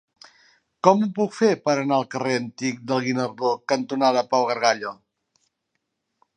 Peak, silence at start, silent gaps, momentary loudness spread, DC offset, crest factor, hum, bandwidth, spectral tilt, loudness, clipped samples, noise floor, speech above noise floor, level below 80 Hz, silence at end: -2 dBFS; 0.85 s; none; 6 LU; under 0.1%; 22 dB; none; 10 kHz; -5 dB/octave; -22 LUFS; under 0.1%; -78 dBFS; 56 dB; -74 dBFS; 1.45 s